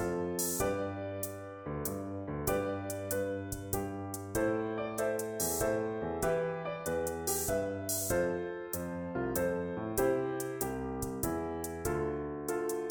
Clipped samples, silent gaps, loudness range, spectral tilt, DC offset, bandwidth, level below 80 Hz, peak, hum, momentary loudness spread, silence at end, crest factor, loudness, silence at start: under 0.1%; none; 3 LU; -4.5 dB/octave; under 0.1%; over 20 kHz; -52 dBFS; -18 dBFS; none; 6 LU; 0 s; 16 dB; -35 LUFS; 0 s